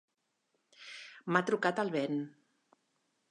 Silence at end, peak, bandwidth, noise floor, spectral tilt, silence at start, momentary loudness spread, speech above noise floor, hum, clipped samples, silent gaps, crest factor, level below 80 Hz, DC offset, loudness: 1 s; -14 dBFS; 11 kHz; -81 dBFS; -6 dB/octave; 0.8 s; 17 LU; 48 dB; none; under 0.1%; none; 24 dB; -88 dBFS; under 0.1%; -33 LUFS